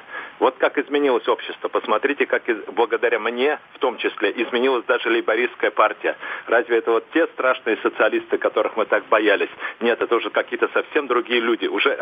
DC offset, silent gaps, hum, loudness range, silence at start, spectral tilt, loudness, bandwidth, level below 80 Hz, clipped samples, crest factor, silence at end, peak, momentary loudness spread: under 0.1%; none; none; 1 LU; 0.1 s; -5.5 dB/octave; -21 LUFS; 5 kHz; -74 dBFS; under 0.1%; 18 dB; 0 s; -2 dBFS; 5 LU